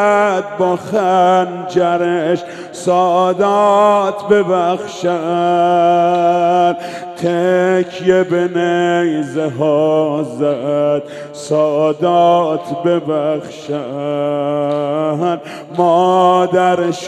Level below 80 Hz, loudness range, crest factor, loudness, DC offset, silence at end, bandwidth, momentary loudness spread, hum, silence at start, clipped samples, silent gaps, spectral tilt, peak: -62 dBFS; 3 LU; 14 dB; -14 LUFS; under 0.1%; 0 s; 11.5 kHz; 9 LU; none; 0 s; under 0.1%; none; -6 dB/octave; 0 dBFS